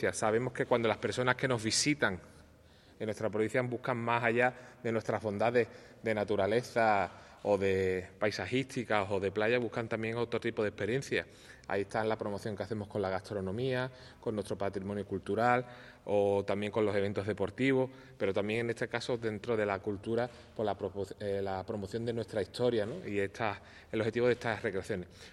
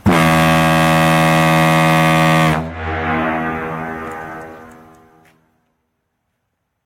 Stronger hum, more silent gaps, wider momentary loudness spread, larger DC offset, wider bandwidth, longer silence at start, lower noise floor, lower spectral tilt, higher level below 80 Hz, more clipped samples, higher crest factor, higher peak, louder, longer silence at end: neither; neither; second, 9 LU vs 15 LU; neither; second, 12.5 kHz vs 16.5 kHz; about the same, 0 s vs 0.05 s; second, -60 dBFS vs -71 dBFS; about the same, -5 dB/octave vs -5.5 dB/octave; second, -64 dBFS vs -42 dBFS; neither; first, 24 dB vs 14 dB; second, -10 dBFS vs -2 dBFS; second, -33 LUFS vs -14 LUFS; second, 0 s vs 2.15 s